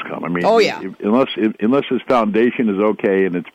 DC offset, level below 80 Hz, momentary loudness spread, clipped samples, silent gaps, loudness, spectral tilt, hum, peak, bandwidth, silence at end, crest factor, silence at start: under 0.1%; -60 dBFS; 4 LU; under 0.1%; none; -17 LUFS; -6.5 dB/octave; none; -4 dBFS; 10.5 kHz; 0.05 s; 12 dB; 0 s